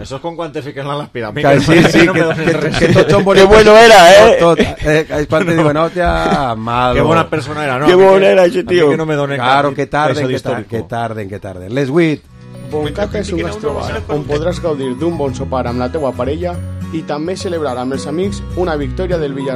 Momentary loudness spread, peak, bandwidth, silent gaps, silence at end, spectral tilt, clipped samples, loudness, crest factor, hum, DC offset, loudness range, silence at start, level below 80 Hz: 15 LU; 0 dBFS; 16 kHz; none; 0 s; -5.5 dB/octave; 0.5%; -12 LUFS; 12 dB; none; under 0.1%; 12 LU; 0 s; -30 dBFS